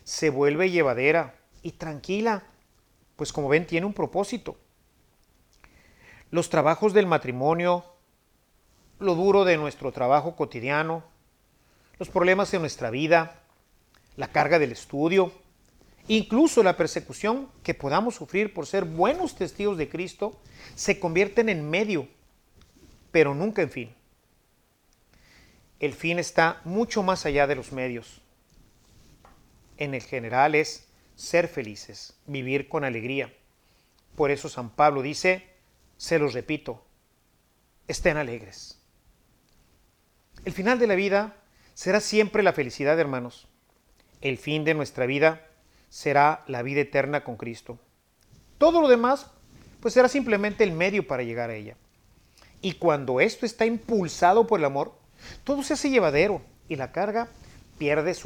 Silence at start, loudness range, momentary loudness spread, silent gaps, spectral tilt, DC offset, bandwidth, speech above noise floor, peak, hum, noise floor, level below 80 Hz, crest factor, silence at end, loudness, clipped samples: 0.05 s; 6 LU; 15 LU; none; -5 dB/octave; under 0.1%; 18.5 kHz; 41 dB; -6 dBFS; none; -66 dBFS; -54 dBFS; 20 dB; 0 s; -25 LUFS; under 0.1%